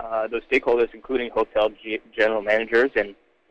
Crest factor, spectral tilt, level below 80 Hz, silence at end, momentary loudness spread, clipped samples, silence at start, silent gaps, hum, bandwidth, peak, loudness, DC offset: 16 dB; -5 dB/octave; -50 dBFS; 0.35 s; 7 LU; under 0.1%; 0 s; none; none; 8.2 kHz; -6 dBFS; -23 LUFS; under 0.1%